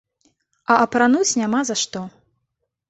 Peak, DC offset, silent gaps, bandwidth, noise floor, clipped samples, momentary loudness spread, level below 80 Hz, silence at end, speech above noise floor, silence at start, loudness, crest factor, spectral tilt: -2 dBFS; under 0.1%; none; 8.2 kHz; -76 dBFS; under 0.1%; 17 LU; -64 dBFS; 0.8 s; 58 dB; 0.7 s; -18 LUFS; 20 dB; -3 dB/octave